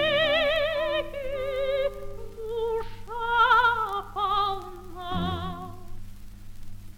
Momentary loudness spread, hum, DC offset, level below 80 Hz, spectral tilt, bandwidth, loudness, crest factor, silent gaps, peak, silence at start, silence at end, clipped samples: 20 LU; none; under 0.1%; -42 dBFS; -5 dB/octave; 16.5 kHz; -26 LUFS; 16 dB; none; -10 dBFS; 0 s; 0 s; under 0.1%